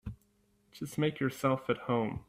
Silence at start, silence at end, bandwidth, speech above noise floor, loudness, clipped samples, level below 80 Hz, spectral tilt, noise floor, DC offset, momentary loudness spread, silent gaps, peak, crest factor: 0.05 s; 0.05 s; 16 kHz; 38 dB; -33 LUFS; under 0.1%; -58 dBFS; -6.5 dB/octave; -71 dBFS; under 0.1%; 12 LU; none; -16 dBFS; 18 dB